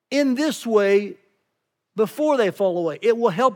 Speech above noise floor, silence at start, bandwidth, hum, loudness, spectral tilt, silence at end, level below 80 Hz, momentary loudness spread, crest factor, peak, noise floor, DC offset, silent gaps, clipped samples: 57 dB; 0.1 s; 18.5 kHz; none; -21 LUFS; -5 dB/octave; 0 s; -88 dBFS; 7 LU; 16 dB; -4 dBFS; -77 dBFS; under 0.1%; none; under 0.1%